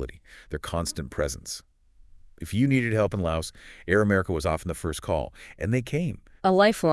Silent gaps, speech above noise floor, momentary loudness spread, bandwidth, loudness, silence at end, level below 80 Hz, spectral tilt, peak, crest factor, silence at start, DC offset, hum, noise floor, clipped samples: none; 27 dB; 16 LU; 12 kHz; -26 LUFS; 0 s; -46 dBFS; -5.5 dB/octave; -6 dBFS; 20 dB; 0 s; under 0.1%; none; -53 dBFS; under 0.1%